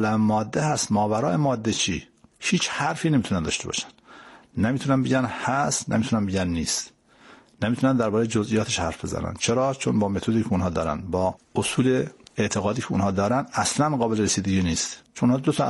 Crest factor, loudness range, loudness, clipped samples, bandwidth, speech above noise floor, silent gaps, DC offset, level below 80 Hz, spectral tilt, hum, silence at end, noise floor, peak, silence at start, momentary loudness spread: 14 dB; 2 LU; -24 LUFS; under 0.1%; 11.5 kHz; 28 dB; none; under 0.1%; -48 dBFS; -5 dB/octave; none; 0 s; -52 dBFS; -10 dBFS; 0 s; 6 LU